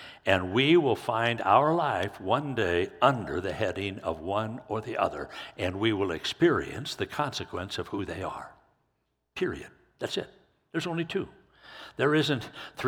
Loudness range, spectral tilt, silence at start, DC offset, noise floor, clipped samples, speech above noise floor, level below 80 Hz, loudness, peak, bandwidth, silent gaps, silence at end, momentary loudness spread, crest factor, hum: 10 LU; -5.5 dB/octave; 0 s; under 0.1%; -77 dBFS; under 0.1%; 49 dB; -58 dBFS; -28 LUFS; -6 dBFS; 16 kHz; none; 0 s; 15 LU; 24 dB; none